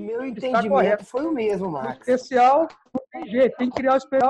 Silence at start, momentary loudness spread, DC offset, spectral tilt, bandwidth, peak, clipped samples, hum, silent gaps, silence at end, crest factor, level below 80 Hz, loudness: 0 s; 11 LU; under 0.1%; -6.5 dB/octave; 9.6 kHz; -6 dBFS; under 0.1%; none; none; 0 s; 16 dB; -60 dBFS; -22 LUFS